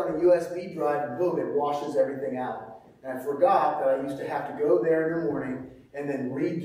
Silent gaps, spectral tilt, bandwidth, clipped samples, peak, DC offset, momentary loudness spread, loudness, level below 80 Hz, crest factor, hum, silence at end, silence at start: none; -7.5 dB/octave; 15.5 kHz; under 0.1%; -10 dBFS; under 0.1%; 13 LU; -27 LUFS; -66 dBFS; 18 dB; none; 0 s; 0 s